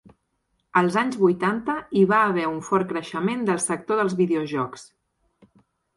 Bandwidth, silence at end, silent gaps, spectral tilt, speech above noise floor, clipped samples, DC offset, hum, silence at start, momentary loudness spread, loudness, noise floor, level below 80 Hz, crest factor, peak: 11.5 kHz; 1.15 s; none; -5.5 dB/octave; 50 dB; under 0.1%; under 0.1%; none; 0.75 s; 8 LU; -23 LUFS; -73 dBFS; -64 dBFS; 18 dB; -6 dBFS